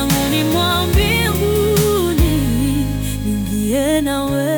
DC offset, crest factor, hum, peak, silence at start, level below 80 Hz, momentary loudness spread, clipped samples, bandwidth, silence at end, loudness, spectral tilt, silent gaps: under 0.1%; 12 dB; none; -4 dBFS; 0 s; -26 dBFS; 5 LU; under 0.1%; 19.5 kHz; 0 s; -16 LUFS; -5 dB/octave; none